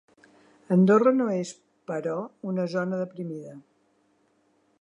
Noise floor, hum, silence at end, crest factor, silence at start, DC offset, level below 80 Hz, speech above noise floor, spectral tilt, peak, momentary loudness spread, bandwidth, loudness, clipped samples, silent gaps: -67 dBFS; none; 1.2 s; 18 dB; 0.7 s; under 0.1%; -80 dBFS; 42 dB; -8 dB/octave; -8 dBFS; 18 LU; 8.8 kHz; -25 LUFS; under 0.1%; none